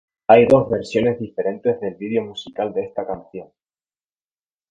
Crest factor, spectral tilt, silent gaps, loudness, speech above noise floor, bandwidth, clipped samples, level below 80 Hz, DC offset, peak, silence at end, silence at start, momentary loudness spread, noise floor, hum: 20 dB; -7 dB/octave; none; -19 LUFS; over 71 dB; 8.8 kHz; under 0.1%; -54 dBFS; under 0.1%; 0 dBFS; 1.25 s; 0.3 s; 17 LU; under -90 dBFS; none